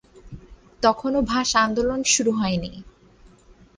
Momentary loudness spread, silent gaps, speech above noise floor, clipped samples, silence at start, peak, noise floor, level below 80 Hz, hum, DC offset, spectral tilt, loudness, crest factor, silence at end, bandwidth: 6 LU; none; 31 dB; under 0.1%; 0.15 s; -4 dBFS; -52 dBFS; -46 dBFS; none; under 0.1%; -3 dB/octave; -21 LUFS; 20 dB; 0.9 s; 10 kHz